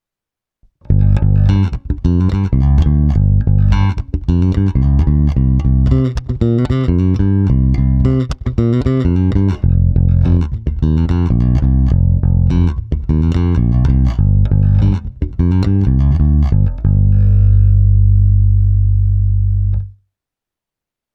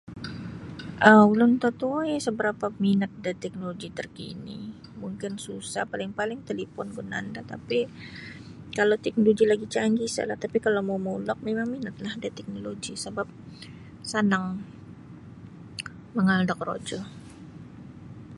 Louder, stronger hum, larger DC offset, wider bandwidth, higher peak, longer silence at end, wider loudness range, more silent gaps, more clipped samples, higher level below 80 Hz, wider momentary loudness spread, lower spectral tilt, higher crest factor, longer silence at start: first, -14 LUFS vs -26 LUFS; neither; neither; second, 6 kHz vs 11.5 kHz; about the same, 0 dBFS vs -2 dBFS; first, 1.25 s vs 0 s; second, 2 LU vs 11 LU; neither; neither; first, -16 dBFS vs -60 dBFS; second, 6 LU vs 22 LU; first, -10 dB/octave vs -5.5 dB/octave; second, 12 dB vs 26 dB; first, 0.9 s vs 0.05 s